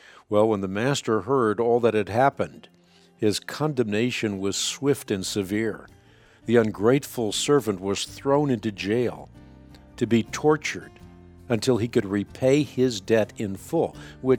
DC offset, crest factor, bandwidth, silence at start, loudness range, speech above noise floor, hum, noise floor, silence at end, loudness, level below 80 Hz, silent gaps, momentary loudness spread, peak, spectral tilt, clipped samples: under 0.1%; 18 dB; 17.5 kHz; 0.3 s; 3 LU; 30 dB; none; -54 dBFS; 0 s; -24 LUFS; -56 dBFS; none; 8 LU; -6 dBFS; -5 dB/octave; under 0.1%